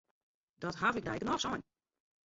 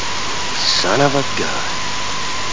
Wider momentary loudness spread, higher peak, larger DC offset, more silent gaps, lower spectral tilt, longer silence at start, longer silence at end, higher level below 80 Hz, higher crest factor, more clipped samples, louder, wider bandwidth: first, 10 LU vs 7 LU; second, -16 dBFS vs 0 dBFS; second, under 0.1% vs 8%; neither; about the same, -3 dB/octave vs -2.5 dB/octave; first, 0.6 s vs 0 s; first, 0.65 s vs 0 s; second, -64 dBFS vs -42 dBFS; about the same, 22 dB vs 18 dB; neither; second, -36 LUFS vs -17 LUFS; about the same, 7.6 kHz vs 7.8 kHz